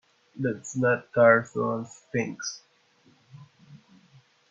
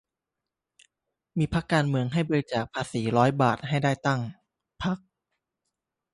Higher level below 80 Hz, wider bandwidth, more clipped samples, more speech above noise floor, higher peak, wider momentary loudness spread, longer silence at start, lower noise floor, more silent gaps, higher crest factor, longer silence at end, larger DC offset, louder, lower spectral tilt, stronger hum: second, -72 dBFS vs -54 dBFS; second, 7.8 kHz vs 11.5 kHz; neither; second, 37 dB vs 62 dB; about the same, -6 dBFS vs -8 dBFS; first, 16 LU vs 9 LU; second, 0.35 s vs 1.35 s; second, -62 dBFS vs -87 dBFS; neither; about the same, 22 dB vs 22 dB; second, 0.75 s vs 1.15 s; neither; about the same, -26 LUFS vs -27 LUFS; about the same, -5.5 dB/octave vs -6.5 dB/octave; neither